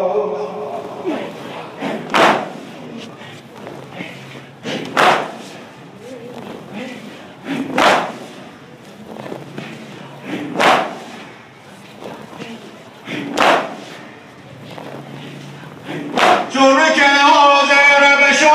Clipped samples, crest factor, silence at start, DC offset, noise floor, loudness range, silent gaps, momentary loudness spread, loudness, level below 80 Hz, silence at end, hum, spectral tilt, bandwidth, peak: under 0.1%; 18 dB; 0 s; under 0.1%; -39 dBFS; 9 LU; none; 25 LU; -13 LUFS; -62 dBFS; 0 s; none; -3 dB/octave; 15.5 kHz; 0 dBFS